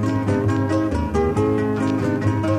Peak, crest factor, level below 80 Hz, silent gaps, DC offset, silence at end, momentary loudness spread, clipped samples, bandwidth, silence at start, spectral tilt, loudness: -6 dBFS; 12 dB; -36 dBFS; none; under 0.1%; 0 s; 1 LU; under 0.1%; 10.5 kHz; 0 s; -8 dB/octave; -21 LUFS